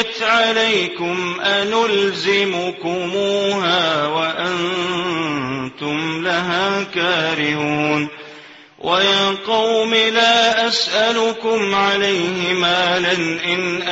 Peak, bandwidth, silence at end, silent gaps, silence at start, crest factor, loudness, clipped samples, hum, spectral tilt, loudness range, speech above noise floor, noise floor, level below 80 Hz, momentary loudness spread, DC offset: -2 dBFS; 8 kHz; 0 s; none; 0 s; 16 dB; -17 LUFS; under 0.1%; none; -3.5 dB/octave; 4 LU; 23 dB; -41 dBFS; -58 dBFS; 7 LU; under 0.1%